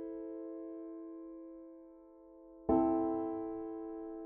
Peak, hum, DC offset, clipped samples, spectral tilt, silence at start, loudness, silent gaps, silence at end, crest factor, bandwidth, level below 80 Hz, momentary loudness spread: -18 dBFS; none; under 0.1%; under 0.1%; -10 dB/octave; 0 s; -38 LUFS; none; 0 s; 22 dB; 2.8 kHz; -62 dBFS; 25 LU